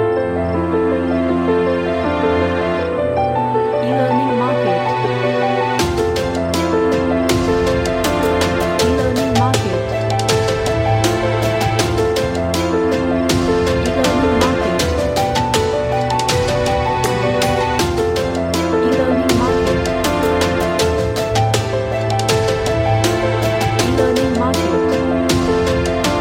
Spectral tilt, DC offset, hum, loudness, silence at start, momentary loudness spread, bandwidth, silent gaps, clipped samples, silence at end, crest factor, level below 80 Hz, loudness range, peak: -5.5 dB/octave; under 0.1%; none; -16 LUFS; 0 s; 3 LU; 16.5 kHz; none; under 0.1%; 0 s; 14 dB; -34 dBFS; 1 LU; -2 dBFS